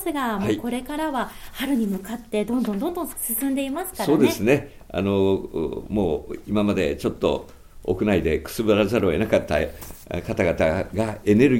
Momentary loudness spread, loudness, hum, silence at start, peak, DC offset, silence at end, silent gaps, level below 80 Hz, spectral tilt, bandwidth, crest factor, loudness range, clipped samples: 9 LU; -23 LUFS; none; 0 s; -4 dBFS; under 0.1%; 0 s; none; -44 dBFS; -6 dB/octave; 17 kHz; 18 dB; 3 LU; under 0.1%